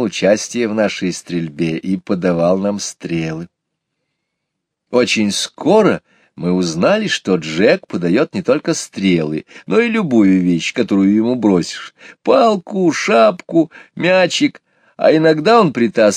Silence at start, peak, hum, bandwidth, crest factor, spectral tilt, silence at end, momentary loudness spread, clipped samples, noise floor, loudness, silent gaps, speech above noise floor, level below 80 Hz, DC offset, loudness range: 0 s; 0 dBFS; none; 13.5 kHz; 16 dB; -5 dB/octave; 0 s; 10 LU; under 0.1%; -76 dBFS; -15 LUFS; none; 62 dB; -56 dBFS; under 0.1%; 6 LU